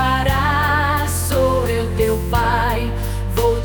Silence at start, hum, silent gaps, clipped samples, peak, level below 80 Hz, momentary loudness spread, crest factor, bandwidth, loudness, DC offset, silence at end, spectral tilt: 0 s; none; none; under 0.1%; -4 dBFS; -26 dBFS; 5 LU; 14 dB; 19.5 kHz; -18 LUFS; under 0.1%; 0 s; -5 dB/octave